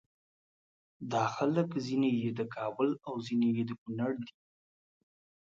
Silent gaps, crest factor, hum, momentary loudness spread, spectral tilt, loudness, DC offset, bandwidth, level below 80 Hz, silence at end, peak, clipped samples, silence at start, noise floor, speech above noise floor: 3.78-3.86 s; 18 dB; none; 8 LU; -7 dB/octave; -33 LUFS; under 0.1%; 7.6 kHz; -76 dBFS; 1.25 s; -18 dBFS; under 0.1%; 1 s; under -90 dBFS; over 58 dB